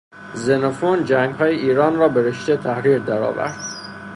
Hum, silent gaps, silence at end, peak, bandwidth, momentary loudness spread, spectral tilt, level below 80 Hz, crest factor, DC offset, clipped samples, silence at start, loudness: none; none; 0 s; -2 dBFS; 11 kHz; 10 LU; -6 dB/octave; -58 dBFS; 16 dB; under 0.1%; under 0.1%; 0.15 s; -19 LUFS